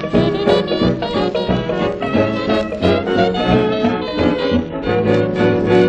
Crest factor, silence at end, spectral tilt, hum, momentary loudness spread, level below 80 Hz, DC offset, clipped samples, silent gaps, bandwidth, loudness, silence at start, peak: 16 dB; 0 s; -7.5 dB/octave; none; 4 LU; -36 dBFS; under 0.1%; under 0.1%; none; 9 kHz; -16 LUFS; 0 s; 0 dBFS